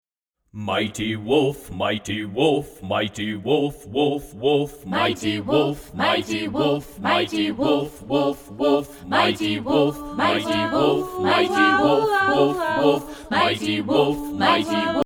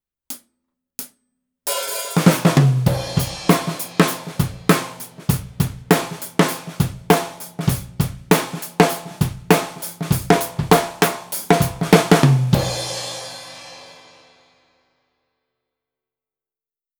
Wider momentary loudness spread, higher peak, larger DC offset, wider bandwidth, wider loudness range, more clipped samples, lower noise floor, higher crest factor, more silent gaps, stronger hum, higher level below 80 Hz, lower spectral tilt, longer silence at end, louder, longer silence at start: second, 7 LU vs 18 LU; second, -4 dBFS vs 0 dBFS; neither; about the same, 20 kHz vs over 20 kHz; about the same, 4 LU vs 4 LU; neither; second, -74 dBFS vs under -90 dBFS; about the same, 18 dB vs 20 dB; neither; neither; second, -50 dBFS vs -42 dBFS; about the same, -5 dB/octave vs -5 dB/octave; second, 0 s vs 3.05 s; about the same, -21 LUFS vs -19 LUFS; first, 0.55 s vs 0.3 s